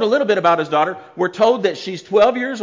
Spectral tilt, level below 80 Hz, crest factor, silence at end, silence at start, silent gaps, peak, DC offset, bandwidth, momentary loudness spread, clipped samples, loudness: -5 dB/octave; -62 dBFS; 14 dB; 0 s; 0 s; none; -4 dBFS; under 0.1%; 7.6 kHz; 8 LU; under 0.1%; -17 LUFS